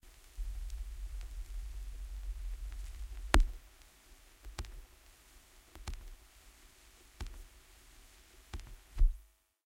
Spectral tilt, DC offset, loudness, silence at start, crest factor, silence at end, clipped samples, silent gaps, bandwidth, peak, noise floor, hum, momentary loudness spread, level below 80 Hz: -4.5 dB/octave; under 0.1%; -42 LUFS; 0.05 s; 32 dB; 0.4 s; under 0.1%; none; 16 kHz; -6 dBFS; -61 dBFS; none; 23 LU; -40 dBFS